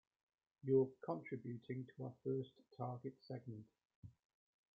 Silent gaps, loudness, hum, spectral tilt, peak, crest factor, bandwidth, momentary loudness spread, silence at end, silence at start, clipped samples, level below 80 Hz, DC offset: 3.85-3.89 s, 3.95-4.03 s; -45 LUFS; none; -8.5 dB/octave; -24 dBFS; 22 dB; 5 kHz; 23 LU; 0.65 s; 0.65 s; under 0.1%; -84 dBFS; under 0.1%